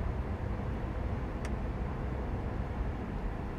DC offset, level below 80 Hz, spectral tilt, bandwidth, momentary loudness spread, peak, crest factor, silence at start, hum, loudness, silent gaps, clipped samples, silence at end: under 0.1%; -38 dBFS; -8 dB/octave; 9.6 kHz; 1 LU; -22 dBFS; 12 dB; 0 s; none; -37 LUFS; none; under 0.1%; 0 s